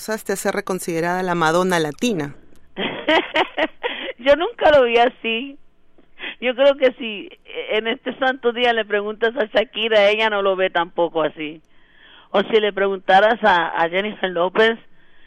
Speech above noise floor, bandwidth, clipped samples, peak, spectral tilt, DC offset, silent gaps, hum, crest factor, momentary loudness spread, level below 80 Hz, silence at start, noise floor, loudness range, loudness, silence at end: 29 dB; 15.5 kHz; under 0.1%; -4 dBFS; -4 dB/octave; under 0.1%; none; none; 16 dB; 12 LU; -52 dBFS; 0 s; -48 dBFS; 3 LU; -19 LUFS; 0 s